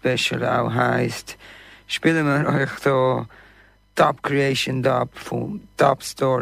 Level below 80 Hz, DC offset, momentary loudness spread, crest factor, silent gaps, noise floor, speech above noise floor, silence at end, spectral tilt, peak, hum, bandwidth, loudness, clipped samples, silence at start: -54 dBFS; under 0.1%; 10 LU; 16 dB; none; -53 dBFS; 32 dB; 0 s; -5.5 dB/octave; -4 dBFS; none; 15.5 kHz; -21 LUFS; under 0.1%; 0.05 s